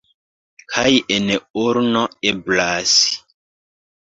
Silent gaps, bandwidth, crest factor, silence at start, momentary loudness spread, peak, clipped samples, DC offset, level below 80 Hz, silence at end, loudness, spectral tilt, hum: 1.50-1.54 s; 7.8 kHz; 18 dB; 0.7 s; 7 LU; 0 dBFS; under 0.1%; under 0.1%; -54 dBFS; 0.95 s; -17 LUFS; -2.5 dB/octave; none